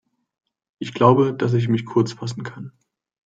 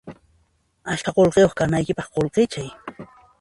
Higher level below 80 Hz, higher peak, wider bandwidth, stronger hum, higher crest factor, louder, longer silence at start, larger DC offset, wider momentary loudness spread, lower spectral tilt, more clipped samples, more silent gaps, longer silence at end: second, -64 dBFS vs -48 dBFS; about the same, -2 dBFS vs -4 dBFS; second, 7.8 kHz vs 11.5 kHz; neither; about the same, 20 dB vs 18 dB; about the same, -19 LUFS vs -20 LUFS; first, 0.8 s vs 0.05 s; neither; about the same, 19 LU vs 20 LU; first, -7.5 dB/octave vs -6 dB/octave; neither; neither; first, 0.55 s vs 0.35 s